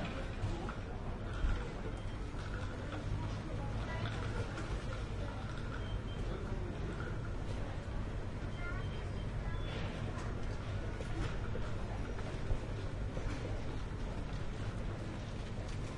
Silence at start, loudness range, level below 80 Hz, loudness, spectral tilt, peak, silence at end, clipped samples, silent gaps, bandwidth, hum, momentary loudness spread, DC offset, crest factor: 0 s; 1 LU; -42 dBFS; -42 LUFS; -6.5 dB/octave; -22 dBFS; 0 s; under 0.1%; none; 11 kHz; none; 3 LU; under 0.1%; 16 dB